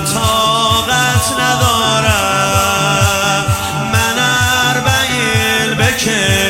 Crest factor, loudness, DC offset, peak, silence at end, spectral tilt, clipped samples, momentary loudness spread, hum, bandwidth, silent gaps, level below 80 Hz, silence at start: 12 dB; -12 LUFS; under 0.1%; 0 dBFS; 0 s; -3 dB/octave; under 0.1%; 2 LU; none; 16.5 kHz; none; -36 dBFS; 0 s